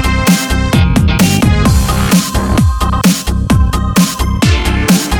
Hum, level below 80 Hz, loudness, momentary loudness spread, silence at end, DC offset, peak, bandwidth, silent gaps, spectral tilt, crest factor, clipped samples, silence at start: none; -16 dBFS; -11 LUFS; 3 LU; 0 s; under 0.1%; 0 dBFS; over 20 kHz; none; -5 dB/octave; 10 dB; under 0.1%; 0 s